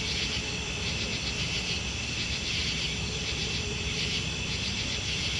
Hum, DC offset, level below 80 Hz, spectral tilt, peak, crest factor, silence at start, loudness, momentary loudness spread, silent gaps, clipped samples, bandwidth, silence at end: none; under 0.1%; -42 dBFS; -2.5 dB/octave; -18 dBFS; 14 dB; 0 s; -29 LUFS; 2 LU; none; under 0.1%; 11.5 kHz; 0 s